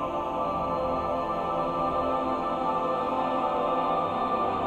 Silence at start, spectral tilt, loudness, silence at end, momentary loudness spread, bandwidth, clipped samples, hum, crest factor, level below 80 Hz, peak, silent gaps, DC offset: 0 s; -7 dB/octave; -28 LUFS; 0 s; 2 LU; 12 kHz; under 0.1%; none; 12 dB; -50 dBFS; -14 dBFS; none; under 0.1%